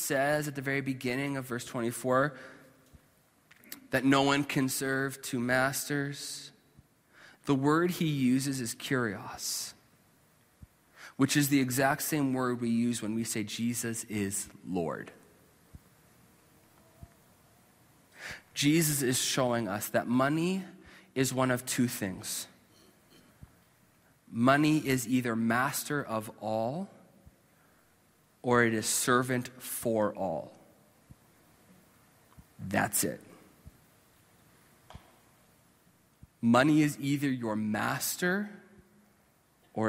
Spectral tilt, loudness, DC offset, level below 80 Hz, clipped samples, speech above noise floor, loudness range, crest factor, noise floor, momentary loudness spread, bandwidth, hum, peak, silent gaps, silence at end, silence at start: -4.5 dB/octave; -30 LUFS; under 0.1%; -66 dBFS; under 0.1%; 37 dB; 7 LU; 22 dB; -67 dBFS; 14 LU; 16 kHz; none; -10 dBFS; none; 0 s; 0 s